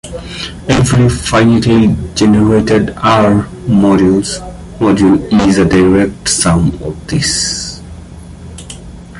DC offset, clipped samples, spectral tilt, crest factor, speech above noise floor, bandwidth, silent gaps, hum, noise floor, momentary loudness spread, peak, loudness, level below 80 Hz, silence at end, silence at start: under 0.1%; under 0.1%; -5.5 dB/octave; 12 dB; 20 dB; 11.5 kHz; none; none; -30 dBFS; 20 LU; 0 dBFS; -10 LUFS; -30 dBFS; 0 s; 0.05 s